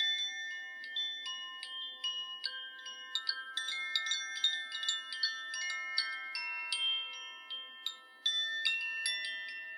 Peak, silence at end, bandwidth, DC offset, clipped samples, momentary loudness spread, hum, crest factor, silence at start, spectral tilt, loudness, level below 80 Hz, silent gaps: -14 dBFS; 0 s; 16 kHz; under 0.1%; under 0.1%; 10 LU; none; 24 dB; 0 s; 6 dB/octave; -35 LUFS; under -90 dBFS; none